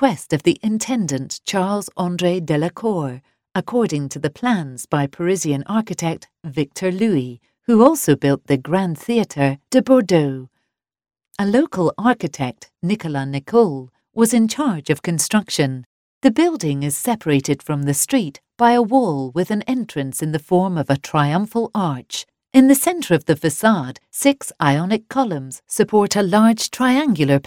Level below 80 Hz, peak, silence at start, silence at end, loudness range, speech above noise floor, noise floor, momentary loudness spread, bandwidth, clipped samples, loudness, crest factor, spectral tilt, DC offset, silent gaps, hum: -58 dBFS; 0 dBFS; 0 s; 0.05 s; 4 LU; 56 dB; -74 dBFS; 10 LU; 18 kHz; under 0.1%; -19 LUFS; 18 dB; -5.5 dB/octave; under 0.1%; 15.86-16.21 s; none